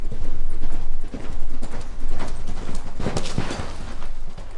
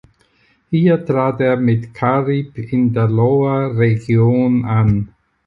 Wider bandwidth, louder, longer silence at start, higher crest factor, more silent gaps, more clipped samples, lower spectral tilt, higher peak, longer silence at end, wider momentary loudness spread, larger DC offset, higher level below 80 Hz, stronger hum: first, 7.8 kHz vs 4.9 kHz; second, -32 LUFS vs -16 LUFS; second, 0 s vs 0.7 s; about the same, 10 dB vs 12 dB; neither; neither; second, -5.5 dB/octave vs -10 dB/octave; second, -6 dBFS vs -2 dBFS; second, 0 s vs 0.4 s; about the same, 8 LU vs 6 LU; neither; first, -24 dBFS vs -44 dBFS; neither